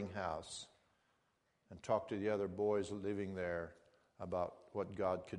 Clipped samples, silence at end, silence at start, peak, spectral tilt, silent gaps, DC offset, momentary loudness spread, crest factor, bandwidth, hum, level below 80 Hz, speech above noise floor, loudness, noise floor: under 0.1%; 0 s; 0 s; -22 dBFS; -5.5 dB/octave; none; under 0.1%; 15 LU; 20 dB; 10.5 kHz; none; -70 dBFS; 40 dB; -41 LUFS; -80 dBFS